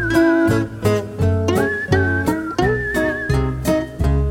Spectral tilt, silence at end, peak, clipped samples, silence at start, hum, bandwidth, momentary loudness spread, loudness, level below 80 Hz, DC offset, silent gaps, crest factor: -6.5 dB/octave; 0 s; -4 dBFS; under 0.1%; 0 s; none; 17 kHz; 5 LU; -18 LUFS; -28 dBFS; under 0.1%; none; 14 dB